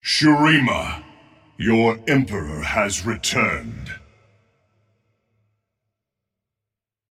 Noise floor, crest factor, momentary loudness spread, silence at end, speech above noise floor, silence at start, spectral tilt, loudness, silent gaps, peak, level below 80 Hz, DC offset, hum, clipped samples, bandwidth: -87 dBFS; 18 dB; 19 LU; 3.15 s; 67 dB; 0.05 s; -4.5 dB/octave; -19 LUFS; none; -4 dBFS; -44 dBFS; under 0.1%; none; under 0.1%; 14.5 kHz